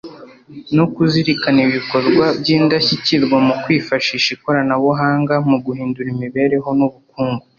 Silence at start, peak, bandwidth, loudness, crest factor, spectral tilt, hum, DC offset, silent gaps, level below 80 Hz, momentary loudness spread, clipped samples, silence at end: 0.05 s; -2 dBFS; 7.2 kHz; -16 LUFS; 14 dB; -6 dB/octave; none; under 0.1%; none; -54 dBFS; 8 LU; under 0.1%; 0.2 s